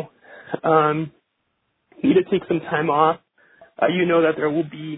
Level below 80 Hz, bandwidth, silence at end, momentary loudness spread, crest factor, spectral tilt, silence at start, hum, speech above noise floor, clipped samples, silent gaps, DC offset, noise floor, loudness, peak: -62 dBFS; 4 kHz; 0 s; 11 LU; 20 dB; -10.5 dB/octave; 0 s; none; 53 dB; under 0.1%; none; under 0.1%; -73 dBFS; -20 LUFS; -2 dBFS